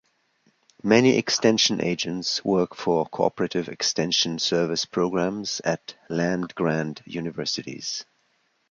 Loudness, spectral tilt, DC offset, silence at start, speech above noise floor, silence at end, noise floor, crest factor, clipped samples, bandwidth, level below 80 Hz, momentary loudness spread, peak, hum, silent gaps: -24 LUFS; -4 dB/octave; under 0.1%; 0.85 s; 44 dB; 0.7 s; -68 dBFS; 20 dB; under 0.1%; 7.6 kHz; -62 dBFS; 12 LU; -4 dBFS; none; none